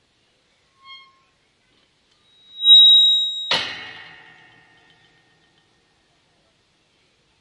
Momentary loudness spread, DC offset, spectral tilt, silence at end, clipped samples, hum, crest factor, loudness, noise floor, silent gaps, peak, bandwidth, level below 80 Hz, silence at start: 25 LU; under 0.1%; 0.5 dB/octave; 3.5 s; under 0.1%; none; 18 dB; -11 LUFS; -63 dBFS; none; -2 dBFS; 11.5 kHz; -74 dBFS; 2.6 s